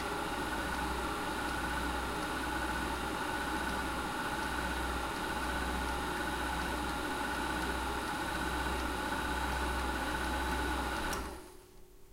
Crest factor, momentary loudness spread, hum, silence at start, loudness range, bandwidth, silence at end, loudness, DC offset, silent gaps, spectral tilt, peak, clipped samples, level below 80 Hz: 14 dB; 2 LU; none; 0 s; 1 LU; 16 kHz; 0 s; -36 LUFS; under 0.1%; none; -4 dB/octave; -22 dBFS; under 0.1%; -44 dBFS